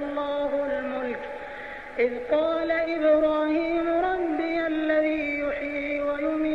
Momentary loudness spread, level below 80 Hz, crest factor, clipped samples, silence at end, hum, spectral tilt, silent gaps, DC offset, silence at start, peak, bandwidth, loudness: 10 LU; -52 dBFS; 14 dB; under 0.1%; 0 s; none; -6.5 dB/octave; none; under 0.1%; 0 s; -12 dBFS; 6.6 kHz; -26 LUFS